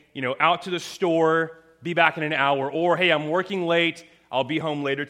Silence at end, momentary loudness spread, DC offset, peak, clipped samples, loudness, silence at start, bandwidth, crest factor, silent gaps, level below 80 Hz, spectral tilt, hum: 0 s; 9 LU; under 0.1%; -2 dBFS; under 0.1%; -23 LUFS; 0.15 s; 14 kHz; 22 dB; none; -72 dBFS; -5 dB/octave; none